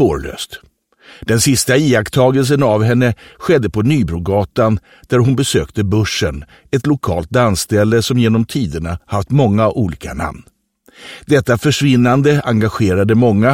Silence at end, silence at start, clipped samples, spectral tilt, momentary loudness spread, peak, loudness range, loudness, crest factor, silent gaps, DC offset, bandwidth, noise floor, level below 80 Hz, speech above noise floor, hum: 0 s; 0 s; under 0.1%; -5.5 dB/octave; 11 LU; 0 dBFS; 3 LU; -14 LUFS; 14 dB; none; under 0.1%; 16.5 kHz; -45 dBFS; -36 dBFS; 32 dB; none